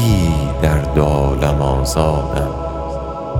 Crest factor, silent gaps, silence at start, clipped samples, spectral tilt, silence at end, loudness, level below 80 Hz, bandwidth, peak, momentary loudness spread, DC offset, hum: 16 dB; none; 0 s; under 0.1%; -6.5 dB/octave; 0 s; -17 LUFS; -22 dBFS; 16.5 kHz; 0 dBFS; 8 LU; under 0.1%; none